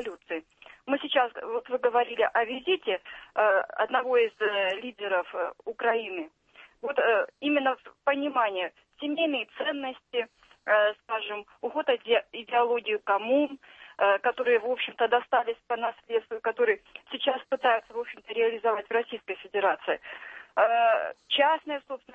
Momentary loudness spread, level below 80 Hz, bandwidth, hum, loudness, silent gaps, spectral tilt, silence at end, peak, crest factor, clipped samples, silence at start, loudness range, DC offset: 11 LU; -74 dBFS; 4.8 kHz; none; -28 LUFS; none; -4.5 dB/octave; 0.2 s; -10 dBFS; 18 dB; under 0.1%; 0 s; 2 LU; under 0.1%